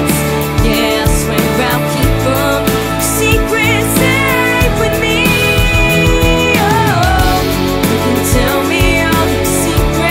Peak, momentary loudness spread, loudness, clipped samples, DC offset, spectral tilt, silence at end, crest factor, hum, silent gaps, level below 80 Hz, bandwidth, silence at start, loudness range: 0 dBFS; 3 LU; -11 LUFS; under 0.1%; under 0.1%; -4.5 dB/octave; 0 s; 12 dB; none; none; -20 dBFS; 16.5 kHz; 0 s; 2 LU